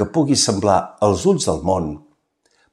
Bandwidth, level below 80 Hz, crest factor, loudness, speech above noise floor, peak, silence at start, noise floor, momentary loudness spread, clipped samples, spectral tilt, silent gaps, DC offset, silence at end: 14 kHz; -44 dBFS; 18 dB; -18 LUFS; 46 dB; -2 dBFS; 0 s; -63 dBFS; 7 LU; under 0.1%; -4.5 dB/octave; none; under 0.1%; 0.75 s